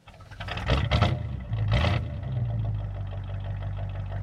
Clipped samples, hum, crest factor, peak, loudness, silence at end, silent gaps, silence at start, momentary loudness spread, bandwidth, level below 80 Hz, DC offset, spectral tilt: under 0.1%; none; 20 dB; -8 dBFS; -29 LUFS; 0 s; none; 0.05 s; 10 LU; 8.4 kHz; -34 dBFS; under 0.1%; -7 dB/octave